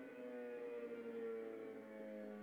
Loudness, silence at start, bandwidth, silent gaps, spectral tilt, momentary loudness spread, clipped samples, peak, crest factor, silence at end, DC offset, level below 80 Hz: -50 LUFS; 0 s; 19.5 kHz; none; -7 dB/octave; 5 LU; under 0.1%; -38 dBFS; 12 dB; 0 s; under 0.1%; under -90 dBFS